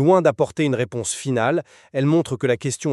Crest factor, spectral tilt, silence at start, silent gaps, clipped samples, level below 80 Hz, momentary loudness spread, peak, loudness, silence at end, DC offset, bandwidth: 16 dB; -5.5 dB/octave; 0 s; none; under 0.1%; -62 dBFS; 7 LU; -4 dBFS; -21 LUFS; 0 s; under 0.1%; 12.5 kHz